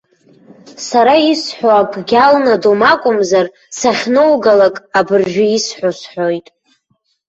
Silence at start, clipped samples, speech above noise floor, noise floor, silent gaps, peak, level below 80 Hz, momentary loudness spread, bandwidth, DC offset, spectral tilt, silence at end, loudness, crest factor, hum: 0.65 s; under 0.1%; 51 dB; -63 dBFS; none; 0 dBFS; -56 dBFS; 9 LU; 8.2 kHz; under 0.1%; -4 dB/octave; 0.9 s; -12 LUFS; 12 dB; none